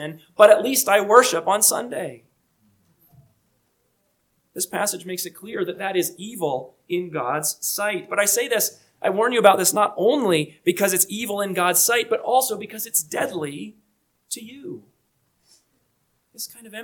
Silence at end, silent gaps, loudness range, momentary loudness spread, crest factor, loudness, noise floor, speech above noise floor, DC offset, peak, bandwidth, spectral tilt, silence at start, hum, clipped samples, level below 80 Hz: 0 s; none; 13 LU; 18 LU; 22 dB; -20 LUFS; -69 dBFS; 48 dB; under 0.1%; 0 dBFS; 19 kHz; -2.5 dB/octave; 0 s; none; under 0.1%; -74 dBFS